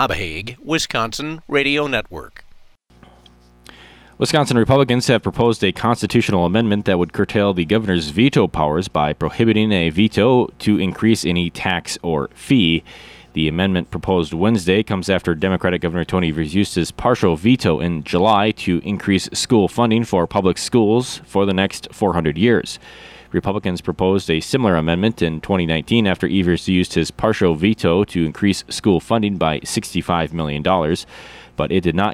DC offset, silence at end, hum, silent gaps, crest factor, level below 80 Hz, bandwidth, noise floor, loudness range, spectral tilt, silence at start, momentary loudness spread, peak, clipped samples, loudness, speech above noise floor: under 0.1%; 0 s; none; none; 14 dB; -42 dBFS; 14.5 kHz; -49 dBFS; 3 LU; -5.5 dB/octave; 0 s; 7 LU; -4 dBFS; under 0.1%; -18 LUFS; 31 dB